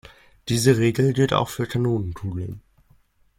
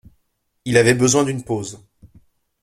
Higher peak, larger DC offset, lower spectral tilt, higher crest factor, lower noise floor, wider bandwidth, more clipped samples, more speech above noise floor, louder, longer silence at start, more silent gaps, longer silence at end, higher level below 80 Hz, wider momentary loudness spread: about the same, -4 dBFS vs -2 dBFS; neither; first, -6 dB/octave vs -4.5 dB/octave; about the same, 20 dB vs 18 dB; second, -59 dBFS vs -68 dBFS; first, 17 kHz vs 14 kHz; neither; second, 38 dB vs 51 dB; second, -22 LUFS vs -17 LUFS; second, 0.45 s vs 0.65 s; neither; about the same, 0.8 s vs 0.85 s; about the same, -50 dBFS vs -52 dBFS; about the same, 16 LU vs 17 LU